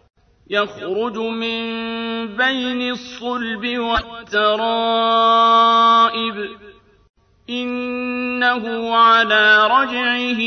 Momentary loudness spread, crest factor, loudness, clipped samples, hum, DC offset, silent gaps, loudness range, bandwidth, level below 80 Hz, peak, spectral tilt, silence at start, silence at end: 12 LU; 16 dB; -17 LUFS; under 0.1%; none; under 0.1%; 7.09-7.14 s; 6 LU; 6.6 kHz; -48 dBFS; -2 dBFS; -4 dB/octave; 0.5 s; 0 s